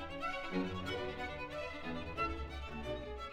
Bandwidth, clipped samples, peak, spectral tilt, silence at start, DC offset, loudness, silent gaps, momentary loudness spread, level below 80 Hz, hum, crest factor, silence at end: 15.5 kHz; under 0.1%; -24 dBFS; -6 dB/octave; 0 s; under 0.1%; -41 LUFS; none; 5 LU; -50 dBFS; none; 16 dB; 0 s